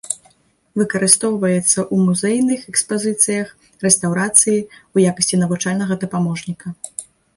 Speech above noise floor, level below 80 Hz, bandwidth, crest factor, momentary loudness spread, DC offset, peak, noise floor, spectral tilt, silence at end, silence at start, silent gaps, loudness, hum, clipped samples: 39 dB; -58 dBFS; 12 kHz; 18 dB; 15 LU; under 0.1%; 0 dBFS; -56 dBFS; -4 dB/octave; 0.35 s; 0.05 s; none; -16 LUFS; none; under 0.1%